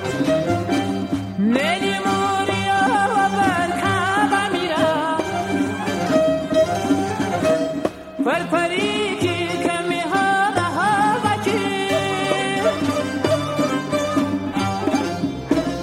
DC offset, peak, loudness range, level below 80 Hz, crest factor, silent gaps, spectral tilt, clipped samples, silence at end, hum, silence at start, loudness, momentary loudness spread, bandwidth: under 0.1%; -4 dBFS; 2 LU; -50 dBFS; 16 dB; none; -5 dB/octave; under 0.1%; 0 s; none; 0 s; -20 LUFS; 5 LU; 16 kHz